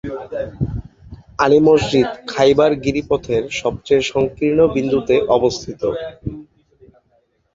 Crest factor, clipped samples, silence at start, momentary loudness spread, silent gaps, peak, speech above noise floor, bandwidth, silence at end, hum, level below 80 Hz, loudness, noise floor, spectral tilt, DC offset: 18 dB; under 0.1%; 0.05 s; 14 LU; none; 0 dBFS; 45 dB; 7.8 kHz; 1.1 s; none; -40 dBFS; -17 LUFS; -61 dBFS; -6 dB/octave; under 0.1%